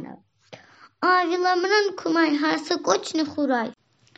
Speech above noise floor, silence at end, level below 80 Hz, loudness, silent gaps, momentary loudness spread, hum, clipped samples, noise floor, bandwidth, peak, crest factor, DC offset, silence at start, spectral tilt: 27 dB; 0.45 s; -78 dBFS; -22 LUFS; none; 6 LU; none; under 0.1%; -49 dBFS; 8.2 kHz; -4 dBFS; 20 dB; under 0.1%; 0 s; -3 dB/octave